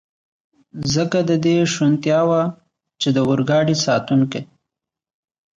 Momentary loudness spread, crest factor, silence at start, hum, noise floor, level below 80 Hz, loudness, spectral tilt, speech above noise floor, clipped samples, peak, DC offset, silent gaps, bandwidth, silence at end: 8 LU; 14 dB; 0.75 s; none; -84 dBFS; -54 dBFS; -18 LUFS; -5.5 dB/octave; 67 dB; under 0.1%; -6 dBFS; under 0.1%; none; 9.4 kHz; 1.15 s